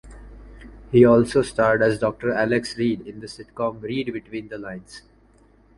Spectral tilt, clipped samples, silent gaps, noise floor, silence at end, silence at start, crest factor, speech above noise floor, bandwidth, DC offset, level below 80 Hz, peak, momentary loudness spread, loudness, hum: -6.5 dB/octave; under 0.1%; none; -55 dBFS; 0.8 s; 0.05 s; 22 dB; 34 dB; 11.5 kHz; under 0.1%; -48 dBFS; -2 dBFS; 20 LU; -21 LUFS; none